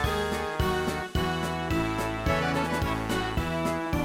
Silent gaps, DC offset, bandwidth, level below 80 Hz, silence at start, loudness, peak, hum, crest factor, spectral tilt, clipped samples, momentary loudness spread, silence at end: none; under 0.1%; 16.5 kHz; -38 dBFS; 0 s; -28 LUFS; -12 dBFS; none; 16 dB; -5.5 dB/octave; under 0.1%; 2 LU; 0 s